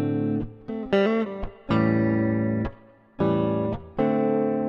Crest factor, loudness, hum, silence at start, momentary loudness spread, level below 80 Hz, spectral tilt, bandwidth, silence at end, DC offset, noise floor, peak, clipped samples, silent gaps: 16 dB; -25 LUFS; none; 0 s; 10 LU; -44 dBFS; -9.5 dB/octave; 5.8 kHz; 0 s; under 0.1%; -48 dBFS; -8 dBFS; under 0.1%; none